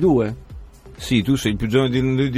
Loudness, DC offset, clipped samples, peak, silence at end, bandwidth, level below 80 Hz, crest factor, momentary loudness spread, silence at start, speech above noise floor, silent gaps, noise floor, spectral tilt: -20 LUFS; under 0.1%; under 0.1%; -4 dBFS; 0 s; 15 kHz; -38 dBFS; 16 dB; 11 LU; 0 s; 20 dB; none; -39 dBFS; -6.5 dB/octave